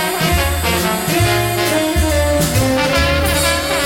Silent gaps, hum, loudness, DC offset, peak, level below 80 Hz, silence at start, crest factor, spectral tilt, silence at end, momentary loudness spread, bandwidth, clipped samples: none; none; -15 LUFS; under 0.1%; -2 dBFS; -24 dBFS; 0 s; 12 dB; -4 dB/octave; 0 s; 2 LU; 17 kHz; under 0.1%